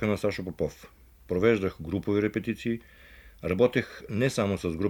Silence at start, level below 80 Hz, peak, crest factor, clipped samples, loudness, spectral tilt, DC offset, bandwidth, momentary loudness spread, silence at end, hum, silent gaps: 0 s; -52 dBFS; -10 dBFS; 20 dB; under 0.1%; -28 LUFS; -6.5 dB/octave; under 0.1%; 19 kHz; 9 LU; 0 s; none; none